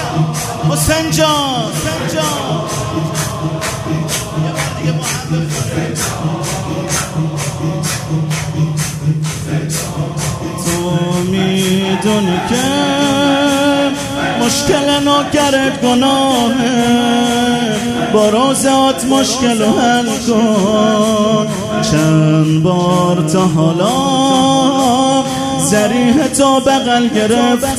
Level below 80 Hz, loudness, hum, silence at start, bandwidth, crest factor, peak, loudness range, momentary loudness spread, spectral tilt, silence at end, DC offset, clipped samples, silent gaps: -40 dBFS; -13 LUFS; none; 0 s; 16 kHz; 14 dB; 0 dBFS; 6 LU; 7 LU; -4.5 dB/octave; 0 s; under 0.1%; under 0.1%; none